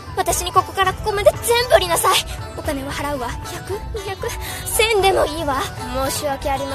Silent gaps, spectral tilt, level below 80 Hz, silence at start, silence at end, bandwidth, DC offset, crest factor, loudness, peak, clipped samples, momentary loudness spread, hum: none; -3 dB/octave; -34 dBFS; 0 s; 0 s; 14 kHz; under 0.1%; 20 dB; -19 LUFS; 0 dBFS; under 0.1%; 12 LU; none